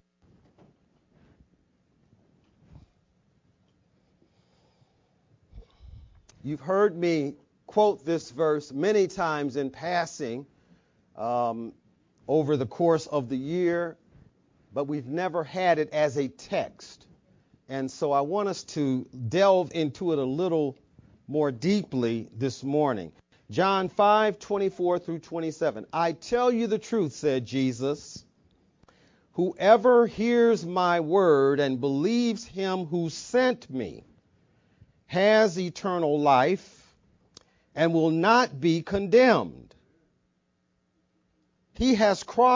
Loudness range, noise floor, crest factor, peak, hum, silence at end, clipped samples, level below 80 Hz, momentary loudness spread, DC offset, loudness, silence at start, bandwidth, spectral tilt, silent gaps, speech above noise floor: 6 LU; -73 dBFS; 22 dB; -4 dBFS; none; 0 s; under 0.1%; -60 dBFS; 13 LU; under 0.1%; -26 LUFS; 5.55 s; 7.6 kHz; -6 dB/octave; none; 48 dB